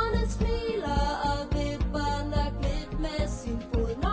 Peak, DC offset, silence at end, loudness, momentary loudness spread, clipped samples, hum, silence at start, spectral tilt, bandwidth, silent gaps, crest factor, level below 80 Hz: -14 dBFS; under 0.1%; 0 s; -30 LUFS; 4 LU; under 0.1%; none; 0 s; -6 dB/octave; 8 kHz; none; 14 dB; -32 dBFS